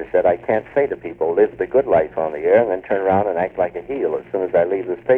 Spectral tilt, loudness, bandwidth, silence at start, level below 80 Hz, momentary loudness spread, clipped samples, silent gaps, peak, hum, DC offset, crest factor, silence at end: -9 dB/octave; -19 LUFS; 3.8 kHz; 0 s; -52 dBFS; 7 LU; under 0.1%; none; -2 dBFS; none; under 0.1%; 16 dB; 0 s